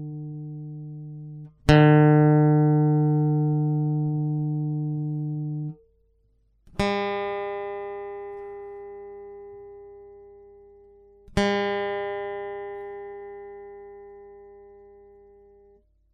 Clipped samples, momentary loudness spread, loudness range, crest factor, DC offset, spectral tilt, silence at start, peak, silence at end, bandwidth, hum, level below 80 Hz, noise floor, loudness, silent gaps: under 0.1%; 25 LU; 20 LU; 24 dB; under 0.1%; -8 dB/octave; 0 s; -2 dBFS; 1.5 s; 7.2 kHz; 50 Hz at -30 dBFS; -48 dBFS; -65 dBFS; -23 LUFS; none